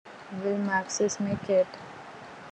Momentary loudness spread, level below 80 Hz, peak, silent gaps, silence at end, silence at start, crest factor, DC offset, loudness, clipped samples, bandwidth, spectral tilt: 18 LU; -68 dBFS; -14 dBFS; none; 0 s; 0.05 s; 16 dB; under 0.1%; -28 LUFS; under 0.1%; 9.4 kHz; -4.5 dB/octave